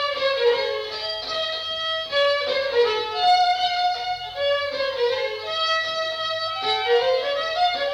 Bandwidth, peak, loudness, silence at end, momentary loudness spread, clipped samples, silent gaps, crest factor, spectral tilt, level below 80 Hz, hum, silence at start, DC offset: 15 kHz; -8 dBFS; -22 LUFS; 0 s; 6 LU; under 0.1%; none; 14 dB; -1 dB/octave; -60 dBFS; none; 0 s; under 0.1%